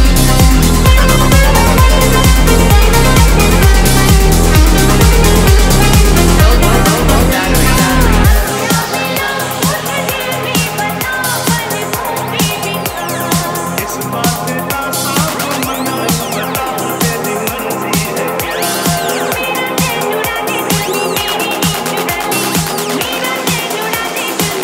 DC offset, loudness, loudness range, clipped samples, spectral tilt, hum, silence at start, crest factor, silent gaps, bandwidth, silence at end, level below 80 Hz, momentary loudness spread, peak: under 0.1%; -12 LUFS; 6 LU; 0.2%; -4 dB/octave; none; 0 s; 10 dB; none; 16.5 kHz; 0 s; -14 dBFS; 7 LU; 0 dBFS